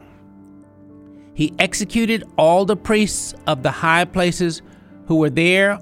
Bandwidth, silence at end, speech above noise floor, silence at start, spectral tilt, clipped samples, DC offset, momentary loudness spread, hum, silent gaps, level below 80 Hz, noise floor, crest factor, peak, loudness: 16 kHz; 0 s; 27 dB; 1.1 s; -4.5 dB/octave; under 0.1%; under 0.1%; 9 LU; none; none; -44 dBFS; -44 dBFS; 18 dB; 0 dBFS; -18 LUFS